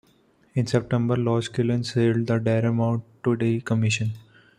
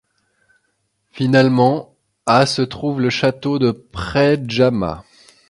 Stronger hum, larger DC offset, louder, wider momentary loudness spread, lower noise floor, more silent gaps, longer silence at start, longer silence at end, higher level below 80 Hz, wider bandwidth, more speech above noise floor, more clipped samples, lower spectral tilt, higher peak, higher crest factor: neither; neither; second, -24 LUFS vs -17 LUFS; second, 5 LU vs 11 LU; second, -61 dBFS vs -68 dBFS; neither; second, 0.55 s vs 1.15 s; about the same, 0.4 s vs 0.5 s; second, -58 dBFS vs -46 dBFS; about the same, 10.5 kHz vs 11.5 kHz; second, 38 dB vs 52 dB; neither; about the same, -6.5 dB/octave vs -6 dB/octave; second, -8 dBFS vs 0 dBFS; about the same, 16 dB vs 18 dB